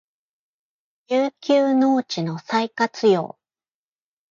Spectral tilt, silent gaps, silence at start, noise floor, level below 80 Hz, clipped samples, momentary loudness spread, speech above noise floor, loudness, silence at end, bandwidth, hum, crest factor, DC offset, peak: -6 dB/octave; none; 1.1 s; under -90 dBFS; -74 dBFS; under 0.1%; 8 LU; over 70 dB; -21 LUFS; 1.05 s; 7.4 kHz; none; 16 dB; under 0.1%; -6 dBFS